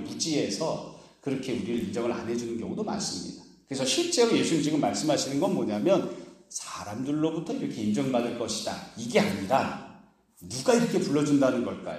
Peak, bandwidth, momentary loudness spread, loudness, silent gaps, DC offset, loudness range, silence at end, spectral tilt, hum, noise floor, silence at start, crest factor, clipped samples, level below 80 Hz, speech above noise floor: -8 dBFS; 15 kHz; 13 LU; -28 LUFS; none; under 0.1%; 5 LU; 0 s; -4.5 dB/octave; none; -54 dBFS; 0 s; 20 dB; under 0.1%; -64 dBFS; 27 dB